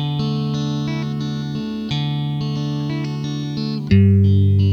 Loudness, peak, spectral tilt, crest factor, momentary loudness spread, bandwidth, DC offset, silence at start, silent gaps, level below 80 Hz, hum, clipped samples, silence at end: -20 LUFS; -4 dBFS; -8 dB/octave; 14 dB; 10 LU; 6.8 kHz; under 0.1%; 0 s; none; -46 dBFS; none; under 0.1%; 0 s